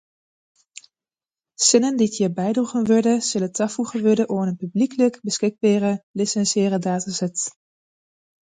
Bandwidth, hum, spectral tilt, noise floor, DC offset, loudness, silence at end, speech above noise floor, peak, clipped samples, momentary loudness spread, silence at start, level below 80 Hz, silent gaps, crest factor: 9.6 kHz; none; -4.5 dB/octave; under -90 dBFS; under 0.1%; -21 LUFS; 0.95 s; over 70 dB; -2 dBFS; under 0.1%; 7 LU; 1.6 s; -68 dBFS; 6.03-6.14 s; 20 dB